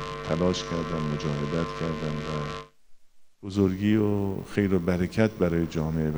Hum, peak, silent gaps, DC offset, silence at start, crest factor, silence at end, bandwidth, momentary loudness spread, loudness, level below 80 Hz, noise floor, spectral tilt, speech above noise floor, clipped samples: none; -8 dBFS; none; under 0.1%; 0 s; 18 dB; 0 s; over 20 kHz; 8 LU; -27 LUFS; -48 dBFS; -48 dBFS; -7 dB/octave; 22 dB; under 0.1%